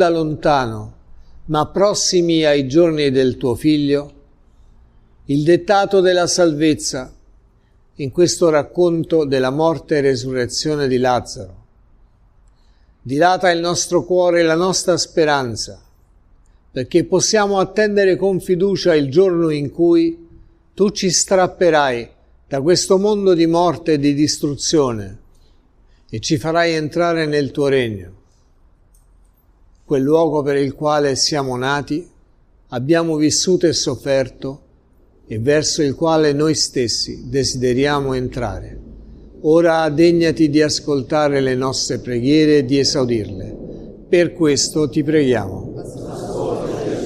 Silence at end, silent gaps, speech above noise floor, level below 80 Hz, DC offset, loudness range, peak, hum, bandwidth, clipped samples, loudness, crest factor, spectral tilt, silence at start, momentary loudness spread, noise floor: 0 s; none; 37 dB; -44 dBFS; under 0.1%; 4 LU; -2 dBFS; none; 13.5 kHz; under 0.1%; -16 LUFS; 16 dB; -4.5 dB/octave; 0 s; 12 LU; -53 dBFS